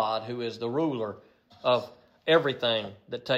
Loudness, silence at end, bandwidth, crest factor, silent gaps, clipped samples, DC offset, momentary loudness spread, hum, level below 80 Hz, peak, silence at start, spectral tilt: -28 LUFS; 0 s; 8 kHz; 20 dB; none; under 0.1%; under 0.1%; 15 LU; none; -74 dBFS; -8 dBFS; 0 s; -6 dB/octave